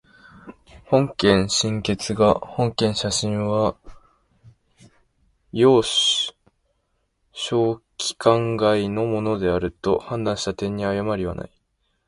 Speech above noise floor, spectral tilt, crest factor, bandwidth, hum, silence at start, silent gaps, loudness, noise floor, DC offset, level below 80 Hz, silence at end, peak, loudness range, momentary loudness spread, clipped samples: 50 dB; -4.5 dB/octave; 22 dB; 11.5 kHz; none; 0.35 s; none; -21 LUFS; -71 dBFS; under 0.1%; -48 dBFS; 0.6 s; -2 dBFS; 3 LU; 9 LU; under 0.1%